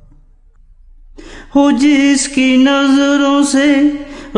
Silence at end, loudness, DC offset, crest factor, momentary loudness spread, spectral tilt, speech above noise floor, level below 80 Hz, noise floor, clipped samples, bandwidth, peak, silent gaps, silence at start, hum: 0 s; -11 LUFS; under 0.1%; 12 dB; 4 LU; -3 dB/octave; 34 dB; -40 dBFS; -44 dBFS; under 0.1%; 11 kHz; 0 dBFS; none; 1.2 s; none